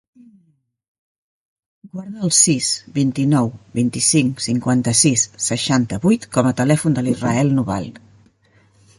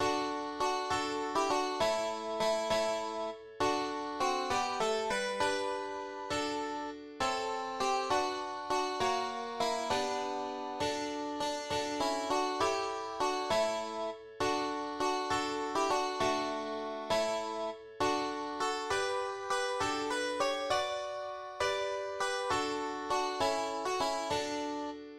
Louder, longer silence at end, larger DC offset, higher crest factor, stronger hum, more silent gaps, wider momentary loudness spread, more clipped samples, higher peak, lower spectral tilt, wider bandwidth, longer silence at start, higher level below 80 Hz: first, -17 LUFS vs -34 LUFS; first, 1 s vs 0 s; neither; about the same, 20 dB vs 18 dB; neither; neither; first, 10 LU vs 6 LU; neither; first, 0 dBFS vs -16 dBFS; first, -4 dB/octave vs -2.5 dB/octave; second, 11.5 kHz vs 15 kHz; first, 1.85 s vs 0 s; first, -52 dBFS vs -62 dBFS